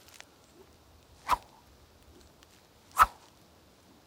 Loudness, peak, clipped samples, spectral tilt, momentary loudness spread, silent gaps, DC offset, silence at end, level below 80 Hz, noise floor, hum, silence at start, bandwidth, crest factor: -28 LUFS; -6 dBFS; under 0.1%; -2 dB/octave; 27 LU; none; under 0.1%; 1 s; -56 dBFS; -60 dBFS; none; 1.25 s; 17.5 kHz; 28 dB